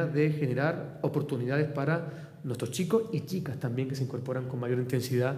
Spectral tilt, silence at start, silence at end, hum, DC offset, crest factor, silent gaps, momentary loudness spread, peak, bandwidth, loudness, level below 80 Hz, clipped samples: -7 dB/octave; 0 s; 0 s; none; under 0.1%; 16 dB; none; 6 LU; -14 dBFS; 15.5 kHz; -31 LUFS; -72 dBFS; under 0.1%